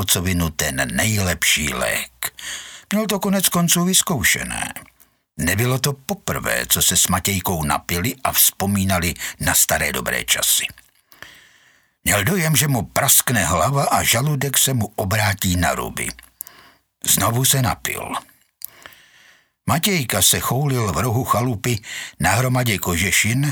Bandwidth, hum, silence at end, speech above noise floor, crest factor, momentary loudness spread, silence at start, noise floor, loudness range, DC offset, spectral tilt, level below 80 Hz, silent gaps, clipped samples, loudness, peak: over 20 kHz; none; 0 s; 37 dB; 20 dB; 12 LU; 0 s; -56 dBFS; 4 LU; under 0.1%; -3 dB/octave; -42 dBFS; none; under 0.1%; -18 LUFS; 0 dBFS